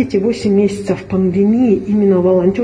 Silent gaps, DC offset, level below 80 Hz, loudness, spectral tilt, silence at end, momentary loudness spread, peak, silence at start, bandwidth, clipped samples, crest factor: none; under 0.1%; -42 dBFS; -14 LUFS; -8 dB/octave; 0 s; 5 LU; -2 dBFS; 0 s; 10 kHz; under 0.1%; 12 dB